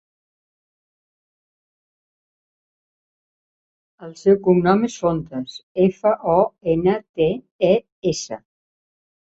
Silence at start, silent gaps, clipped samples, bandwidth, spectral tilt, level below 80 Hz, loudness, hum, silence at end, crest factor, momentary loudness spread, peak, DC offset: 4 s; 5.63-5.75 s, 7.09-7.14 s, 7.51-7.59 s, 7.92-8.02 s; under 0.1%; 8 kHz; -6.5 dB/octave; -54 dBFS; -20 LUFS; none; 0.9 s; 20 dB; 14 LU; -2 dBFS; under 0.1%